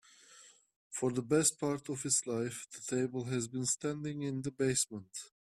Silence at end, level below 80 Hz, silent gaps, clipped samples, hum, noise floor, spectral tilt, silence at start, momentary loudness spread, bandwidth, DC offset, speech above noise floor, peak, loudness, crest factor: 0.25 s; -72 dBFS; 0.76-0.90 s; under 0.1%; none; -60 dBFS; -4 dB/octave; 0.3 s; 12 LU; 15 kHz; under 0.1%; 25 dB; -14 dBFS; -34 LUFS; 22 dB